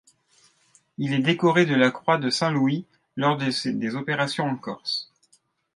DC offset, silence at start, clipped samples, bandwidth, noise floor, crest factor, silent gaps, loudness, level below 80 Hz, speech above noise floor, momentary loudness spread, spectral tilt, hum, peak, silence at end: under 0.1%; 1 s; under 0.1%; 11.5 kHz; -65 dBFS; 20 dB; none; -24 LUFS; -72 dBFS; 42 dB; 11 LU; -5.5 dB/octave; none; -4 dBFS; 0.7 s